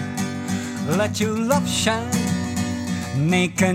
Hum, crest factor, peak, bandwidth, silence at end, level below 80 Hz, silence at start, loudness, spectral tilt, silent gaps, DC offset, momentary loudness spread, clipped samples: none; 16 dB; -6 dBFS; 16.5 kHz; 0 s; -52 dBFS; 0 s; -22 LUFS; -4.5 dB/octave; none; under 0.1%; 7 LU; under 0.1%